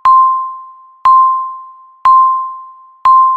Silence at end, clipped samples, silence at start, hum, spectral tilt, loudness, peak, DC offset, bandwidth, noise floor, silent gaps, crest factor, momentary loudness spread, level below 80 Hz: 0 s; under 0.1%; 0.05 s; none; -2 dB/octave; -10 LUFS; 0 dBFS; under 0.1%; 4.6 kHz; -34 dBFS; none; 10 dB; 19 LU; -52 dBFS